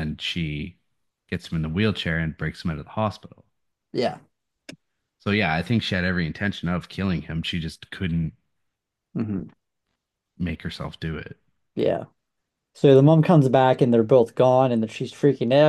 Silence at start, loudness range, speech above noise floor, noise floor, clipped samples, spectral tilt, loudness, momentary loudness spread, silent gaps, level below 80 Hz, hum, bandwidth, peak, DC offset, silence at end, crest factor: 0 s; 13 LU; 59 dB; -80 dBFS; under 0.1%; -7.5 dB/octave; -23 LUFS; 16 LU; none; -50 dBFS; none; 12 kHz; -4 dBFS; under 0.1%; 0 s; 20 dB